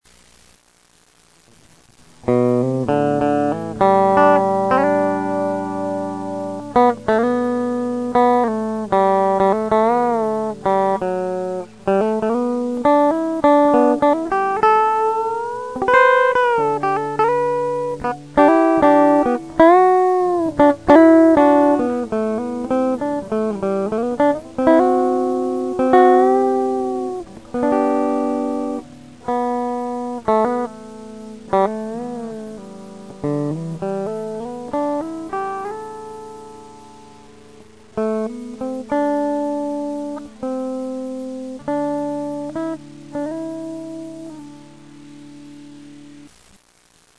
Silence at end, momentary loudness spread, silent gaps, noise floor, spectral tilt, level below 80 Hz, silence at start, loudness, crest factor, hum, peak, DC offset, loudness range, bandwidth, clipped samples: 0.9 s; 16 LU; none; -55 dBFS; -7 dB/octave; -52 dBFS; 2.25 s; -18 LUFS; 18 dB; none; 0 dBFS; 0.3%; 12 LU; 11 kHz; under 0.1%